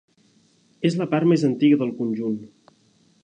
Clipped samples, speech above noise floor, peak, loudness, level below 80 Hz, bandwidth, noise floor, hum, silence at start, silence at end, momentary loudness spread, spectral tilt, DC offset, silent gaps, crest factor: under 0.1%; 40 dB; -8 dBFS; -22 LUFS; -72 dBFS; 9.4 kHz; -60 dBFS; none; 0.8 s; 0.75 s; 9 LU; -7.5 dB/octave; under 0.1%; none; 16 dB